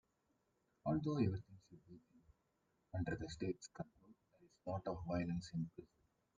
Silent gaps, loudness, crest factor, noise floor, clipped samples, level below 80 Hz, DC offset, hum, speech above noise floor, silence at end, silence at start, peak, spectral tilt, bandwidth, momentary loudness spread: none; -44 LUFS; 20 dB; -83 dBFS; under 0.1%; -66 dBFS; under 0.1%; none; 40 dB; 0.55 s; 0.85 s; -26 dBFS; -7.5 dB/octave; 9 kHz; 23 LU